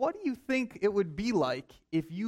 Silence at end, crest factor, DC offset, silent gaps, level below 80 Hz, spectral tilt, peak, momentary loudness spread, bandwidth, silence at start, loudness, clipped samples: 0 s; 14 dB; under 0.1%; none; -60 dBFS; -6.5 dB/octave; -16 dBFS; 6 LU; 14 kHz; 0 s; -32 LUFS; under 0.1%